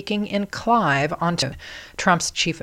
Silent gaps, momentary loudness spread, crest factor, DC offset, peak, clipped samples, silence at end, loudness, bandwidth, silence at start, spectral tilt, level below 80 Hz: none; 8 LU; 20 dB; under 0.1%; -4 dBFS; under 0.1%; 0 s; -21 LUFS; 16 kHz; 0 s; -4 dB/octave; -48 dBFS